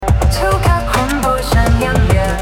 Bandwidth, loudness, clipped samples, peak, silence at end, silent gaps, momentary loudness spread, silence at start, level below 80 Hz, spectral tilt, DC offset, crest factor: 17 kHz; -14 LUFS; under 0.1%; 0 dBFS; 0 s; none; 2 LU; 0 s; -18 dBFS; -5.5 dB/octave; under 0.1%; 12 dB